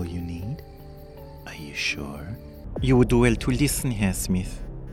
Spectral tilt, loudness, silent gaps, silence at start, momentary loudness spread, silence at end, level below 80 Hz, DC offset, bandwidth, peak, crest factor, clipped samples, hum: -5.5 dB/octave; -24 LUFS; none; 0 s; 23 LU; 0 s; -36 dBFS; under 0.1%; 16.5 kHz; -6 dBFS; 20 dB; under 0.1%; none